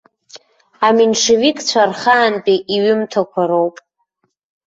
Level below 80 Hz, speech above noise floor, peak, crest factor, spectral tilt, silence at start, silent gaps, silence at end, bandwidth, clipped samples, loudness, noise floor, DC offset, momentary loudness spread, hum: -60 dBFS; 54 dB; -2 dBFS; 14 dB; -3 dB/octave; 0.35 s; none; 0.95 s; 8 kHz; under 0.1%; -14 LUFS; -68 dBFS; under 0.1%; 5 LU; none